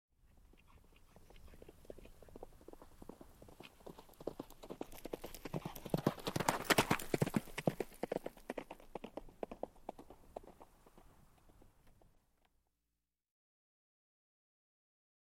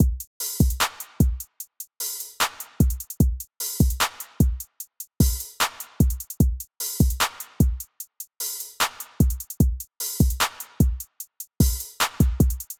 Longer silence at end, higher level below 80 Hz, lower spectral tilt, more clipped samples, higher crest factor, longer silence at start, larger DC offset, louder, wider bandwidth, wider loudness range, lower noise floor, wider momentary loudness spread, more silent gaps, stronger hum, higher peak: first, 3.2 s vs 0.05 s; second, -62 dBFS vs -28 dBFS; about the same, -4.5 dB/octave vs -4.5 dB/octave; neither; first, 34 dB vs 18 dB; first, 0.35 s vs 0 s; neither; second, -41 LUFS vs -25 LUFS; second, 16.5 kHz vs over 20 kHz; first, 22 LU vs 1 LU; first, -90 dBFS vs -42 dBFS; first, 23 LU vs 13 LU; second, none vs 0.27-0.40 s; neither; second, -12 dBFS vs -6 dBFS